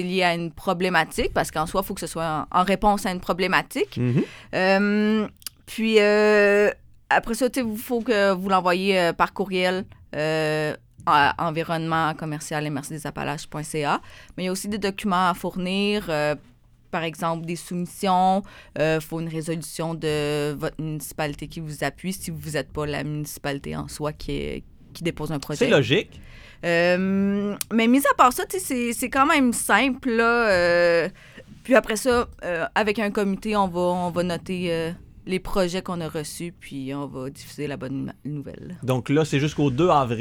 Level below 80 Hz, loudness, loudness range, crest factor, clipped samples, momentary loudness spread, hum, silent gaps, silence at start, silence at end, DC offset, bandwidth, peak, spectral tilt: -46 dBFS; -23 LUFS; 9 LU; 22 dB; under 0.1%; 13 LU; none; none; 0 s; 0 s; under 0.1%; over 20 kHz; -2 dBFS; -5 dB/octave